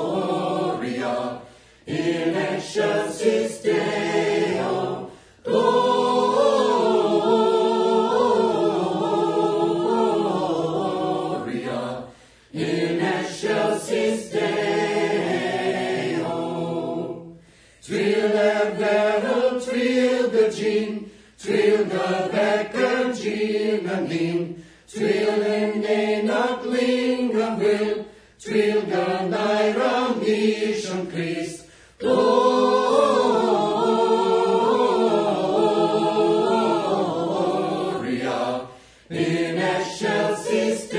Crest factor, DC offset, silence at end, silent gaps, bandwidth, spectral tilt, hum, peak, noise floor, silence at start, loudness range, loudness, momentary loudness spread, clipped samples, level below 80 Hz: 16 dB; under 0.1%; 0 s; none; 10.5 kHz; -5 dB/octave; none; -4 dBFS; -50 dBFS; 0 s; 5 LU; -22 LUFS; 9 LU; under 0.1%; -62 dBFS